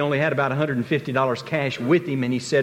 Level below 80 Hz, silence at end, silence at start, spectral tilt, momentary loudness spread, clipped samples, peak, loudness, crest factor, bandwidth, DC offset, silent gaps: -62 dBFS; 0 s; 0 s; -6.5 dB/octave; 4 LU; under 0.1%; -8 dBFS; -23 LUFS; 14 dB; 15 kHz; under 0.1%; none